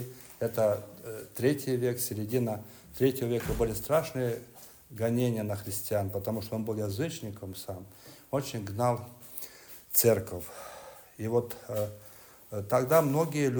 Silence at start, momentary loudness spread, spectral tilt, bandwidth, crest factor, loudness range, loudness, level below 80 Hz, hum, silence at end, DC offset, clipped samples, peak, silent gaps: 0 s; 19 LU; -5.5 dB/octave; over 20 kHz; 24 dB; 4 LU; -31 LUFS; -54 dBFS; none; 0 s; under 0.1%; under 0.1%; -8 dBFS; none